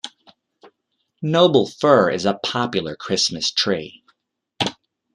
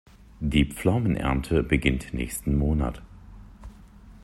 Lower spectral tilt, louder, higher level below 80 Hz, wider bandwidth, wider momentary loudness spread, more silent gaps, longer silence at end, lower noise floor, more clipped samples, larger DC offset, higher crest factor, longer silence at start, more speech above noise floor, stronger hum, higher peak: second, -4 dB/octave vs -6 dB/octave; first, -19 LUFS vs -25 LUFS; second, -62 dBFS vs -34 dBFS; second, 11 kHz vs 13.5 kHz; about the same, 11 LU vs 9 LU; neither; first, 0.4 s vs 0.05 s; first, -73 dBFS vs -48 dBFS; neither; neither; about the same, 20 dB vs 20 dB; second, 0.05 s vs 0.4 s; first, 54 dB vs 24 dB; neither; first, -2 dBFS vs -8 dBFS